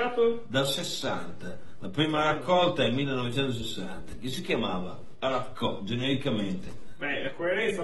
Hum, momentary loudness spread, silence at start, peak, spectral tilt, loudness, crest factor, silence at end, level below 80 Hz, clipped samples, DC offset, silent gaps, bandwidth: none; 14 LU; 0 s; -10 dBFS; -5 dB/octave; -29 LUFS; 18 dB; 0 s; -54 dBFS; under 0.1%; 2%; none; 12 kHz